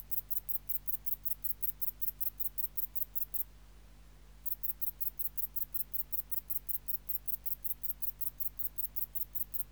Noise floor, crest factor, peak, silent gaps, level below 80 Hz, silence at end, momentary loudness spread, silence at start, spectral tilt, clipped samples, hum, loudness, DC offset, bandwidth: -57 dBFS; 18 dB; -18 dBFS; none; -58 dBFS; 0 s; 2 LU; 0 s; -2.5 dB/octave; under 0.1%; 50 Hz at -55 dBFS; -34 LUFS; under 0.1%; over 20 kHz